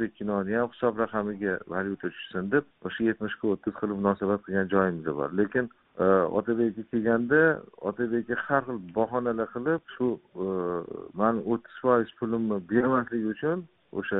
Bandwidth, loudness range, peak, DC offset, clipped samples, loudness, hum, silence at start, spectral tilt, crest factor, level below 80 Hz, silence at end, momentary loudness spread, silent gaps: 4 kHz; 4 LU; -8 dBFS; under 0.1%; under 0.1%; -28 LUFS; none; 0 s; -6 dB/octave; 18 dB; -62 dBFS; 0 s; 8 LU; none